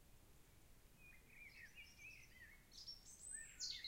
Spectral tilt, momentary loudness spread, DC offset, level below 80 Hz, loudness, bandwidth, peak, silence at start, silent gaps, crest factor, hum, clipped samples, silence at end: 0 dB/octave; 18 LU; under 0.1%; -70 dBFS; -56 LUFS; 16.5 kHz; -36 dBFS; 0 s; none; 22 dB; none; under 0.1%; 0 s